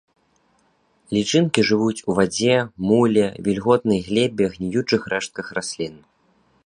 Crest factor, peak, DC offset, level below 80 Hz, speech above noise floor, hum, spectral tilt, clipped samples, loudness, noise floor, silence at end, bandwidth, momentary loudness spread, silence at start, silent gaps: 22 dB; 0 dBFS; under 0.1%; -54 dBFS; 43 dB; none; -5 dB/octave; under 0.1%; -20 LUFS; -63 dBFS; 0.7 s; 10.5 kHz; 10 LU; 1.1 s; none